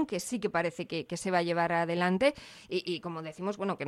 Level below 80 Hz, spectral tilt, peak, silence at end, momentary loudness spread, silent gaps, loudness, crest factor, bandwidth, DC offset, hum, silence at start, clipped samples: -68 dBFS; -5 dB/octave; -12 dBFS; 0 s; 9 LU; none; -31 LUFS; 18 dB; 14 kHz; under 0.1%; none; 0 s; under 0.1%